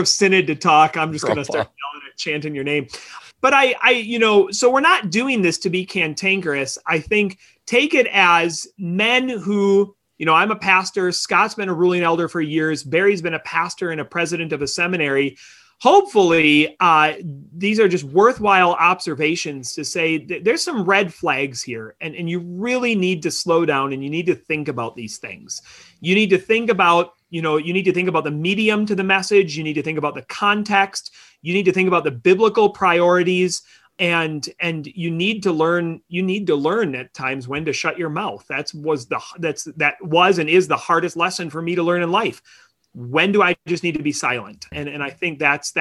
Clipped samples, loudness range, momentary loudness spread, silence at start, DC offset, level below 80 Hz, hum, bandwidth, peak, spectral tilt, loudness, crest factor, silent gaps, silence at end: under 0.1%; 5 LU; 12 LU; 0 s; under 0.1%; -58 dBFS; none; 12.5 kHz; -2 dBFS; -4 dB/octave; -18 LUFS; 16 dB; none; 0 s